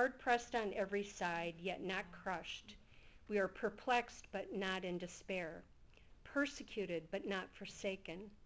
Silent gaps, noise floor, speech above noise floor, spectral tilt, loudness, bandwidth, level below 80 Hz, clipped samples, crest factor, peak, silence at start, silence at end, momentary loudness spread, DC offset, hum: none; -63 dBFS; 21 dB; -4.5 dB/octave; -42 LUFS; 8 kHz; -68 dBFS; under 0.1%; 20 dB; -22 dBFS; 0 s; 0 s; 11 LU; under 0.1%; none